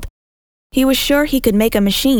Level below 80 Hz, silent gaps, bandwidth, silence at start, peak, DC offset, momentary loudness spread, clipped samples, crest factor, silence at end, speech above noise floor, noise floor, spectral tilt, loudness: -32 dBFS; 0.10-0.70 s; over 20 kHz; 0 s; 0 dBFS; under 0.1%; 3 LU; under 0.1%; 16 dB; 0 s; over 76 dB; under -90 dBFS; -4.5 dB/octave; -15 LUFS